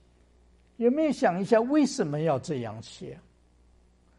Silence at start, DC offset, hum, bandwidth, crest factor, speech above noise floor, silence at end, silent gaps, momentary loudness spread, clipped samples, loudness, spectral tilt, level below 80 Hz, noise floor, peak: 0.8 s; under 0.1%; none; 11.5 kHz; 20 dB; 35 dB; 1 s; none; 18 LU; under 0.1%; -26 LUFS; -6 dB/octave; -62 dBFS; -61 dBFS; -8 dBFS